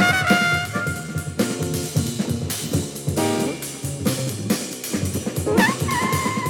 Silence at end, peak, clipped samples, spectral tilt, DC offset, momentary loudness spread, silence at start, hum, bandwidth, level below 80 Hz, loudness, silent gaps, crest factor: 0 s; -4 dBFS; under 0.1%; -4.5 dB/octave; under 0.1%; 8 LU; 0 s; none; 19 kHz; -46 dBFS; -22 LUFS; none; 18 dB